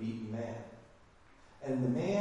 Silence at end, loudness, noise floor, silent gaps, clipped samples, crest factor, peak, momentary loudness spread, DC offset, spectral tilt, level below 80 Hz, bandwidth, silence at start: 0 s; -37 LUFS; -61 dBFS; none; under 0.1%; 18 dB; -20 dBFS; 19 LU; under 0.1%; -7.5 dB/octave; -68 dBFS; 10.5 kHz; 0 s